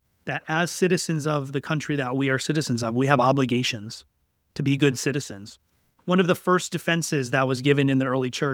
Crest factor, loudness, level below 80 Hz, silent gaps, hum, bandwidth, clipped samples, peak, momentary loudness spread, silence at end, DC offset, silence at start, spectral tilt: 22 dB; -23 LUFS; -64 dBFS; none; none; 18 kHz; under 0.1%; -2 dBFS; 11 LU; 0 s; under 0.1%; 0.25 s; -5 dB/octave